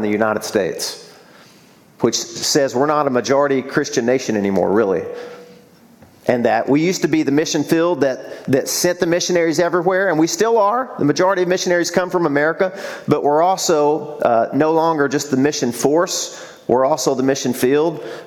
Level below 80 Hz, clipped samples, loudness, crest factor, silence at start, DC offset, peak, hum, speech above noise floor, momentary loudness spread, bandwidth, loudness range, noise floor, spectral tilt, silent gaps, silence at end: -60 dBFS; under 0.1%; -17 LUFS; 16 dB; 0 s; under 0.1%; 0 dBFS; none; 31 dB; 6 LU; 17.5 kHz; 3 LU; -48 dBFS; -4 dB/octave; none; 0 s